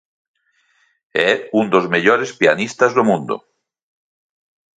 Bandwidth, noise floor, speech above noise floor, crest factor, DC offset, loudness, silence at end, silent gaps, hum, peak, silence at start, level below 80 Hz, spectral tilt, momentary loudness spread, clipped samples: 9.4 kHz; -61 dBFS; 45 dB; 18 dB; under 0.1%; -16 LUFS; 1.4 s; none; none; 0 dBFS; 1.15 s; -64 dBFS; -5 dB/octave; 8 LU; under 0.1%